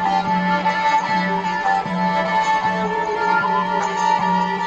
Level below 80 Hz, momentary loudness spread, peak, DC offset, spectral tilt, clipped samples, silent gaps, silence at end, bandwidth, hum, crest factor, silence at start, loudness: -54 dBFS; 3 LU; -6 dBFS; under 0.1%; -5 dB/octave; under 0.1%; none; 0 s; 8.6 kHz; none; 12 dB; 0 s; -19 LUFS